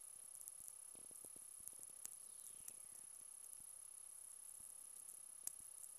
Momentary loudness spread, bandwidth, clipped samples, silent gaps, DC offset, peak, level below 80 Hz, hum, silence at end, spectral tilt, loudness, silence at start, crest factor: 4 LU; 16 kHz; under 0.1%; none; under 0.1%; -26 dBFS; -88 dBFS; none; 0 s; 0.5 dB/octave; -54 LUFS; 0 s; 30 dB